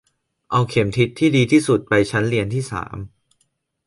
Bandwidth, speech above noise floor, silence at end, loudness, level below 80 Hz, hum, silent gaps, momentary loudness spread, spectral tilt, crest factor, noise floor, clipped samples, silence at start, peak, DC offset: 11.5 kHz; 50 dB; 0.8 s; -19 LUFS; -48 dBFS; none; none; 14 LU; -6 dB/octave; 16 dB; -68 dBFS; under 0.1%; 0.5 s; -4 dBFS; under 0.1%